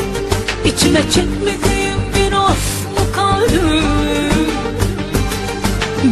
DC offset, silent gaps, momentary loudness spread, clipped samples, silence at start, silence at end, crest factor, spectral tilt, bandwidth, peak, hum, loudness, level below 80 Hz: under 0.1%; none; 5 LU; under 0.1%; 0 s; 0 s; 14 dB; -4.5 dB/octave; 13.5 kHz; 0 dBFS; none; -15 LUFS; -24 dBFS